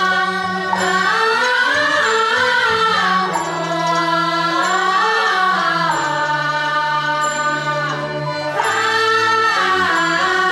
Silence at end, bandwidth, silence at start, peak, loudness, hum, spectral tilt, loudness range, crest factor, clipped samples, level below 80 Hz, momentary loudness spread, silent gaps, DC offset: 0 s; 15.5 kHz; 0 s; -4 dBFS; -16 LUFS; none; -3 dB/octave; 3 LU; 14 dB; under 0.1%; -62 dBFS; 5 LU; none; under 0.1%